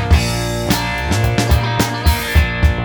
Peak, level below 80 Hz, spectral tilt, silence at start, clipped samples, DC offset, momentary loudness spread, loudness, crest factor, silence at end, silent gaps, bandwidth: 0 dBFS; -18 dBFS; -5 dB/octave; 0 s; under 0.1%; under 0.1%; 3 LU; -16 LUFS; 14 dB; 0 s; none; over 20 kHz